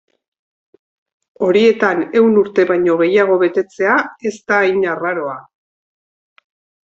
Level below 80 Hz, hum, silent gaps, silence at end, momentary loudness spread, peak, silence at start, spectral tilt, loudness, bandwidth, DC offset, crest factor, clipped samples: -62 dBFS; none; none; 1.45 s; 10 LU; -2 dBFS; 1.4 s; -6 dB/octave; -15 LUFS; 7.8 kHz; under 0.1%; 14 dB; under 0.1%